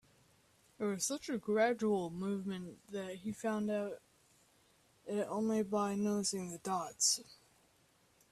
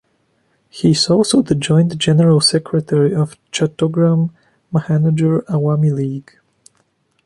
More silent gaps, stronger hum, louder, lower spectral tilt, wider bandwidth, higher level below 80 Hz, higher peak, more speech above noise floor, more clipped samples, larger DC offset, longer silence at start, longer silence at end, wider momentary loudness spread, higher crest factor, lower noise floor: neither; neither; second, -37 LUFS vs -15 LUFS; second, -3.5 dB/octave vs -6 dB/octave; first, 14 kHz vs 11.5 kHz; second, -76 dBFS vs -54 dBFS; second, -20 dBFS vs -2 dBFS; second, 34 dB vs 48 dB; neither; neither; about the same, 0.8 s vs 0.75 s; about the same, 0.95 s vs 1.05 s; first, 12 LU vs 9 LU; about the same, 18 dB vs 14 dB; first, -71 dBFS vs -62 dBFS